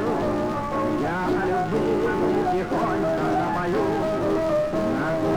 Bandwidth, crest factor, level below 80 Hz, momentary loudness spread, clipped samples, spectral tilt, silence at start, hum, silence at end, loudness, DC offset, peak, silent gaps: 19 kHz; 10 dB; -44 dBFS; 2 LU; under 0.1%; -7 dB/octave; 0 s; none; 0 s; -24 LUFS; under 0.1%; -12 dBFS; none